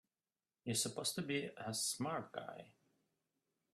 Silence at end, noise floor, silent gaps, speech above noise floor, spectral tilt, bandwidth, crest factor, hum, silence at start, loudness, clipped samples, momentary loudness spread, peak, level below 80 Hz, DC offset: 1 s; under -90 dBFS; none; over 48 dB; -3 dB/octave; 15 kHz; 20 dB; none; 0.65 s; -41 LUFS; under 0.1%; 12 LU; -24 dBFS; -82 dBFS; under 0.1%